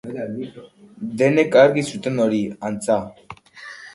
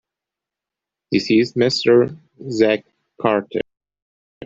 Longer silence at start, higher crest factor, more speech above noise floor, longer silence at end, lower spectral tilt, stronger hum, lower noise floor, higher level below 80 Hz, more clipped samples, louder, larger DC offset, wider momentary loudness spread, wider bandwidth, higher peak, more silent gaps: second, 0.05 s vs 1.1 s; about the same, 20 dB vs 18 dB; second, 21 dB vs 69 dB; about the same, 0.05 s vs 0 s; about the same, -6 dB/octave vs -5.5 dB/octave; neither; second, -41 dBFS vs -86 dBFS; about the same, -60 dBFS vs -60 dBFS; neither; about the same, -19 LUFS vs -18 LUFS; neither; first, 22 LU vs 13 LU; first, 11.5 kHz vs 7.8 kHz; about the same, 0 dBFS vs -2 dBFS; second, none vs 4.02-4.41 s